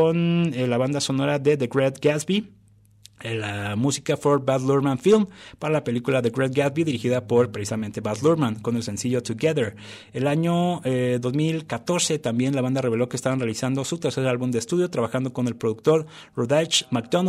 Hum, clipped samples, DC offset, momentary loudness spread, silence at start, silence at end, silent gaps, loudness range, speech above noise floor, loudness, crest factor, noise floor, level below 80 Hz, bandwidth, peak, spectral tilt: none; under 0.1%; under 0.1%; 7 LU; 0 s; 0 s; none; 2 LU; 30 dB; -23 LUFS; 14 dB; -53 dBFS; -62 dBFS; 14.5 kHz; -8 dBFS; -5.5 dB/octave